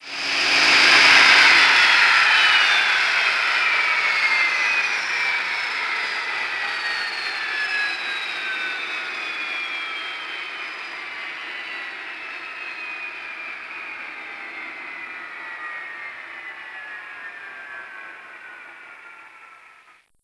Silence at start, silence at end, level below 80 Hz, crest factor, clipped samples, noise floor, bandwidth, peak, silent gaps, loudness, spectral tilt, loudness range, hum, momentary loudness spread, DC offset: 0 s; 0.7 s; -66 dBFS; 22 dB; under 0.1%; -53 dBFS; 11 kHz; 0 dBFS; none; -17 LUFS; 0.5 dB/octave; 21 LU; none; 22 LU; under 0.1%